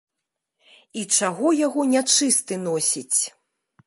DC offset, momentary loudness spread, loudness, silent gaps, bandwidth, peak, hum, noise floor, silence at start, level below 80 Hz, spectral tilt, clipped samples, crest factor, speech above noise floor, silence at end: under 0.1%; 10 LU; -20 LUFS; none; 12 kHz; -4 dBFS; none; -83 dBFS; 0.95 s; -78 dBFS; -2 dB/octave; under 0.1%; 18 dB; 61 dB; 0.6 s